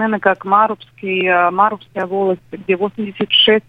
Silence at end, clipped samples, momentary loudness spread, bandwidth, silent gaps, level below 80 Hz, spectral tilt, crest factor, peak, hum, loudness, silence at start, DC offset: 0.1 s; under 0.1%; 10 LU; 5.2 kHz; none; -58 dBFS; -6.5 dB/octave; 16 dB; 0 dBFS; none; -16 LUFS; 0 s; under 0.1%